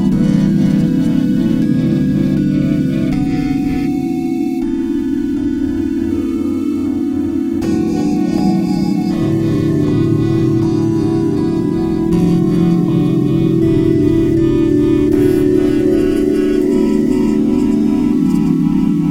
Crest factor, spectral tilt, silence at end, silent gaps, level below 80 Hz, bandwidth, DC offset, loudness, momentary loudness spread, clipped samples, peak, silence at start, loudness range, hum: 12 dB; -8.5 dB/octave; 0 s; none; -34 dBFS; 15.5 kHz; under 0.1%; -14 LUFS; 5 LU; under 0.1%; 0 dBFS; 0 s; 4 LU; none